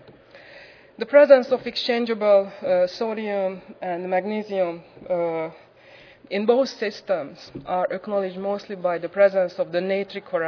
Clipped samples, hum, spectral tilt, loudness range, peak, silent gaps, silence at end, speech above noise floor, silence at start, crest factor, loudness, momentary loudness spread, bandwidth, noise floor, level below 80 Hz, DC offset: under 0.1%; none; -6 dB/octave; 6 LU; -2 dBFS; none; 0 s; 27 dB; 0.35 s; 22 dB; -22 LUFS; 12 LU; 5.4 kHz; -49 dBFS; -68 dBFS; under 0.1%